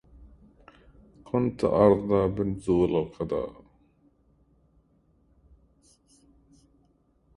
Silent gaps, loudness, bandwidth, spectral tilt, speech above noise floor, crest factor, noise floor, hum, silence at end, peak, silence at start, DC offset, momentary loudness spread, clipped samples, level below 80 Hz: none; -25 LUFS; 11 kHz; -9 dB/octave; 41 dB; 24 dB; -66 dBFS; none; 3.85 s; -6 dBFS; 0.2 s; under 0.1%; 11 LU; under 0.1%; -52 dBFS